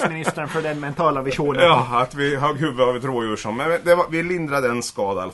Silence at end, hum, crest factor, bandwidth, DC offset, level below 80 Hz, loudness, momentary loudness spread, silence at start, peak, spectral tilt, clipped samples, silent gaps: 0 s; none; 18 dB; 11.5 kHz; under 0.1%; -50 dBFS; -20 LUFS; 8 LU; 0 s; -2 dBFS; -5 dB/octave; under 0.1%; none